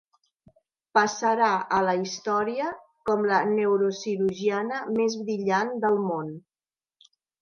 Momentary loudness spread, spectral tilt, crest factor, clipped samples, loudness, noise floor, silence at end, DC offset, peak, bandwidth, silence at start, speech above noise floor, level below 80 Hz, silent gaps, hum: 8 LU; -5 dB/octave; 18 dB; under 0.1%; -25 LUFS; under -90 dBFS; 1 s; under 0.1%; -8 dBFS; 7.2 kHz; 0.95 s; over 65 dB; -70 dBFS; none; none